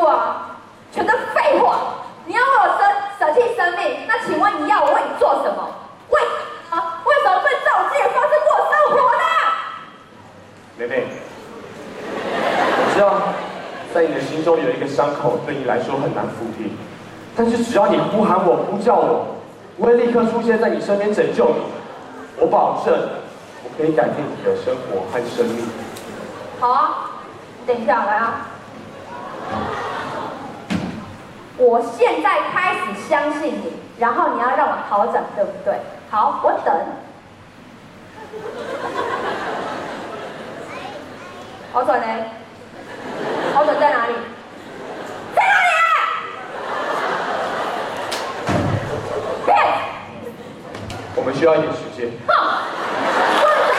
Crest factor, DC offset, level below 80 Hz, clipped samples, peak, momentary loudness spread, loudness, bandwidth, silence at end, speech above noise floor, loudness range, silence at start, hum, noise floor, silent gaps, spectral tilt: 16 dB; under 0.1%; -56 dBFS; under 0.1%; -4 dBFS; 18 LU; -18 LUFS; 13.5 kHz; 0 s; 24 dB; 8 LU; 0 s; none; -42 dBFS; none; -5 dB/octave